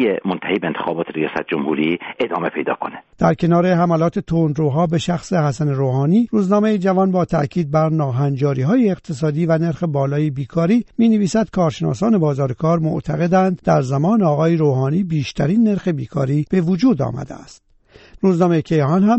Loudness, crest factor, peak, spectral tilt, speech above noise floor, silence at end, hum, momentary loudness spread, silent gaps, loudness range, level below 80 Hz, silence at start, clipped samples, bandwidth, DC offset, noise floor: -18 LUFS; 16 dB; -2 dBFS; -8 dB/octave; 28 dB; 0 s; none; 6 LU; none; 2 LU; -48 dBFS; 0 s; under 0.1%; 8.2 kHz; under 0.1%; -45 dBFS